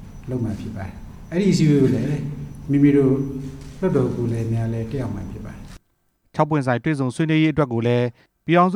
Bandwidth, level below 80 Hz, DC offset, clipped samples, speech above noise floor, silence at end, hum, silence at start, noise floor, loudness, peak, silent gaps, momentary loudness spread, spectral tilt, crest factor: 12 kHz; -42 dBFS; under 0.1%; under 0.1%; 46 dB; 0 s; none; 0 s; -66 dBFS; -21 LUFS; -4 dBFS; none; 17 LU; -7.5 dB/octave; 18 dB